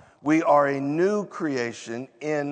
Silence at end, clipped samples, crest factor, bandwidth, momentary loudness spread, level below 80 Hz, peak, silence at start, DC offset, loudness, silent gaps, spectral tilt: 0 s; under 0.1%; 18 dB; 9.2 kHz; 13 LU; -76 dBFS; -6 dBFS; 0.25 s; under 0.1%; -24 LUFS; none; -6 dB/octave